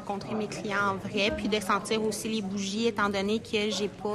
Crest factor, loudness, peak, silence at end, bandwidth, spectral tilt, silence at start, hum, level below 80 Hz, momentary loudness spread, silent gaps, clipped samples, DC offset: 18 dB; -29 LUFS; -12 dBFS; 0 s; 14 kHz; -4 dB/octave; 0 s; none; -54 dBFS; 5 LU; none; under 0.1%; under 0.1%